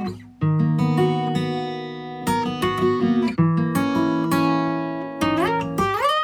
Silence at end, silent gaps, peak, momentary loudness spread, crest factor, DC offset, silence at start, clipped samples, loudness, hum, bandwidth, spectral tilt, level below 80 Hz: 0 s; none; -8 dBFS; 8 LU; 14 dB; under 0.1%; 0 s; under 0.1%; -22 LUFS; none; 18 kHz; -6.5 dB/octave; -52 dBFS